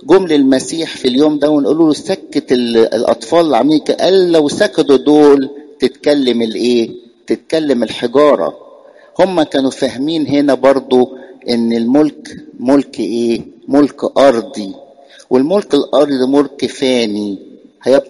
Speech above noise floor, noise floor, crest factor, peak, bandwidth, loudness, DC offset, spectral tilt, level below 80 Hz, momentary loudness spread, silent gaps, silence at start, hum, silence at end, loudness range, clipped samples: 28 dB; -40 dBFS; 12 dB; 0 dBFS; 11.5 kHz; -13 LUFS; under 0.1%; -5 dB/octave; -52 dBFS; 10 LU; none; 0.05 s; none; 0.05 s; 4 LU; under 0.1%